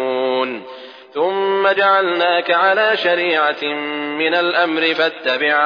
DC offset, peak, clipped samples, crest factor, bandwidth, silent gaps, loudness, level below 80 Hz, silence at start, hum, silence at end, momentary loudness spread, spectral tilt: under 0.1%; -4 dBFS; under 0.1%; 14 dB; 5.4 kHz; none; -16 LUFS; -78 dBFS; 0 s; none; 0 s; 9 LU; -5 dB/octave